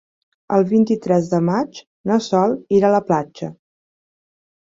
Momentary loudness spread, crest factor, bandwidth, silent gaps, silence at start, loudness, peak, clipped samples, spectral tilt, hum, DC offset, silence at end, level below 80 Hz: 14 LU; 16 dB; 7.8 kHz; 1.87-2.04 s; 0.5 s; -18 LUFS; -4 dBFS; under 0.1%; -7.5 dB/octave; none; under 0.1%; 1.15 s; -60 dBFS